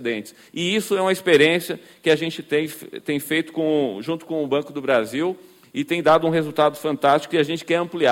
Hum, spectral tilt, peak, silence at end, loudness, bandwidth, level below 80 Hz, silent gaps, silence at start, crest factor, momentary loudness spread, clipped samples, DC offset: none; -5 dB/octave; -4 dBFS; 0 s; -21 LUFS; 17 kHz; -64 dBFS; none; 0 s; 18 dB; 12 LU; under 0.1%; under 0.1%